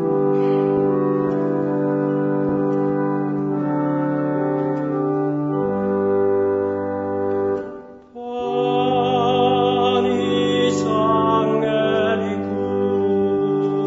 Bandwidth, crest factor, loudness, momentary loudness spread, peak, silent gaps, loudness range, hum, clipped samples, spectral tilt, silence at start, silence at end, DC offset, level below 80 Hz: 7.8 kHz; 14 dB; -20 LUFS; 6 LU; -6 dBFS; none; 3 LU; none; under 0.1%; -7 dB/octave; 0 s; 0 s; under 0.1%; -58 dBFS